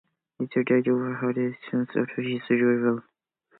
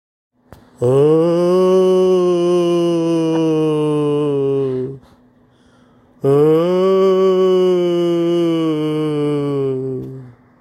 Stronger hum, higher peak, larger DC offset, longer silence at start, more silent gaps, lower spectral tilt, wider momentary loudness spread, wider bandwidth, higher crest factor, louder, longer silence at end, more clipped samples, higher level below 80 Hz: neither; second, -10 dBFS vs -4 dBFS; neither; second, 0.4 s vs 0.8 s; neither; first, -11.5 dB/octave vs -8 dB/octave; about the same, 7 LU vs 8 LU; second, 4.1 kHz vs 13 kHz; about the same, 16 dB vs 12 dB; second, -26 LUFS vs -15 LUFS; first, 0.6 s vs 0.3 s; neither; second, -76 dBFS vs -60 dBFS